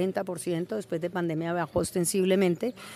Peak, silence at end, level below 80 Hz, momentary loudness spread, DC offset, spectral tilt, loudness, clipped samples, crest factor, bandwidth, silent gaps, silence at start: -12 dBFS; 0 s; -60 dBFS; 8 LU; under 0.1%; -5.5 dB/octave; -28 LUFS; under 0.1%; 16 dB; 14.5 kHz; none; 0 s